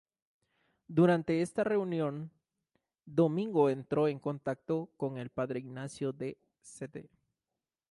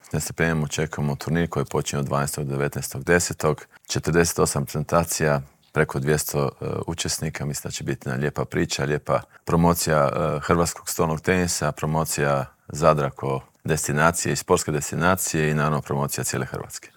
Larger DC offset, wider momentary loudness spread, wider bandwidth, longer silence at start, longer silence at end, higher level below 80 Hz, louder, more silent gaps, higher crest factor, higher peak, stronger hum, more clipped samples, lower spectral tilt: neither; first, 17 LU vs 9 LU; second, 11.5 kHz vs 19.5 kHz; first, 0.9 s vs 0.1 s; first, 0.85 s vs 0.1 s; second, -72 dBFS vs -48 dBFS; second, -32 LUFS vs -23 LUFS; neither; about the same, 18 dB vs 22 dB; second, -16 dBFS vs -2 dBFS; neither; neither; first, -7.5 dB/octave vs -4.5 dB/octave